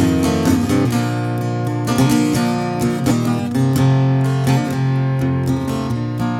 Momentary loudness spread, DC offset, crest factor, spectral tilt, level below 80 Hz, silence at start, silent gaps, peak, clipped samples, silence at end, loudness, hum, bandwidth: 6 LU; under 0.1%; 14 dB; -6.5 dB/octave; -42 dBFS; 0 s; none; -2 dBFS; under 0.1%; 0 s; -17 LUFS; none; 16 kHz